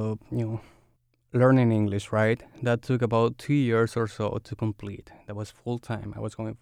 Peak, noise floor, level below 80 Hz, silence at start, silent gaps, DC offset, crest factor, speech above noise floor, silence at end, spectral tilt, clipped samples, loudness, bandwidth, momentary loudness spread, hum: -8 dBFS; -67 dBFS; -58 dBFS; 0 s; none; under 0.1%; 18 dB; 41 dB; 0.05 s; -8 dB/octave; under 0.1%; -26 LUFS; 11.5 kHz; 16 LU; none